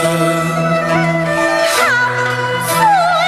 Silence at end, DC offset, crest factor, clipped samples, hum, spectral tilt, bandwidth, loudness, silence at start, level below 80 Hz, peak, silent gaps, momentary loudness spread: 0 s; under 0.1%; 14 dB; under 0.1%; none; -4 dB/octave; 15 kHz; -13 LUFS; 0 s; -50 dBFS; 0 dBFS; none; 4 LU